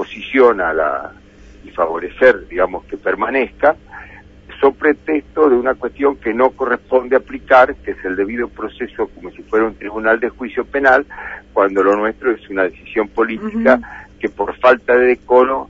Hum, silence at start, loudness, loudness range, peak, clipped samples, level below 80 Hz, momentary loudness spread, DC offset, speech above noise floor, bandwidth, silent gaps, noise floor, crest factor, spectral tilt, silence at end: none; 0 s; -16 LUFS; 3 LU; 0 dBFS; under 0.1%; -44 dBFS; 12 LU; under 0.1%; 23 dB; 7.2 kHz; none; -39 dBFS; 16 dB; -6.5 dB/octave; 0.05 s